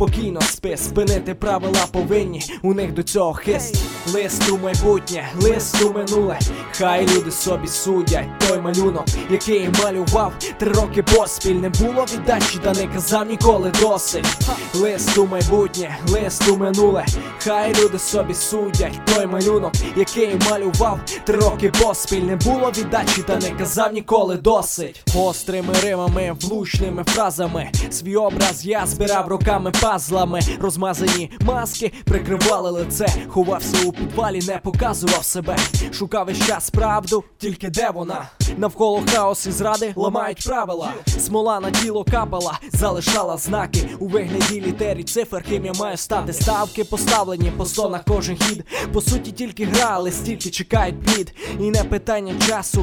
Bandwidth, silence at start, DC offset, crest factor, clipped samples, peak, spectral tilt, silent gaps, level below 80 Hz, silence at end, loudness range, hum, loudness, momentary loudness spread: 19.5 kHz; 0 s; under 0.1%; 18 dB; under 0.1%; 0 dBFS; -4 dB/octave; none; -30 dBFS; 0 s; 3 LU; none; -19 LUFS; 6 LU